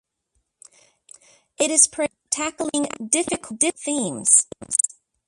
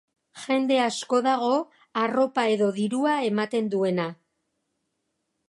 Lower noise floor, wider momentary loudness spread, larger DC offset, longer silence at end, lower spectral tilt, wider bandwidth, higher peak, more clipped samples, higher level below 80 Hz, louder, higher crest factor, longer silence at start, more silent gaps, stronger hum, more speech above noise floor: second, -73 dBFS vs -78 dBFS; first, 10 LU vs 5 LU; neither; second, 0.4 s vs 1.35 s; second, -1.5 dB/octave vs -5 dB/octave; about the same, 11.5 kHz vs 11.5 kHz; first, 0 dBFS vs -10 dBFS; neither; first, -64 dBFS vs -78 dBFS; first, -20 LUFS vs -25 LUFS; first, 24 dB vs 16 dB; first, 1.6 s vs 0.35 s; neither; neither; about the same, 51 dB vs 54 dB